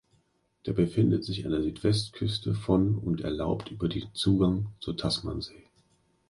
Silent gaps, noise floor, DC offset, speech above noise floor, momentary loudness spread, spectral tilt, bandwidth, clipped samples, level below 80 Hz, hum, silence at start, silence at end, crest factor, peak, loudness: none; -70 dBFS; under 0.1%; 42 dB; 8 LU; -7 dB/octave; 11.5 kHz; under 0.1%; -48 dBFS; none; 0.65 s; 0.75 s; 18 dB; -10 dBFS; -29 LUFS